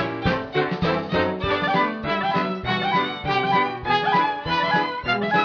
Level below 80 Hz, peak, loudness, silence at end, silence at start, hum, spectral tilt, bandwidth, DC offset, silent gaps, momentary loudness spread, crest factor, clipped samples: -46 dBFS; -6 dBFS; -22 LUFS; 0 s; 0 s; none; -6.5 dB/octave; 5.4 kHz; under 0.1%; none; 3 LU; 16 dB; under 0.1%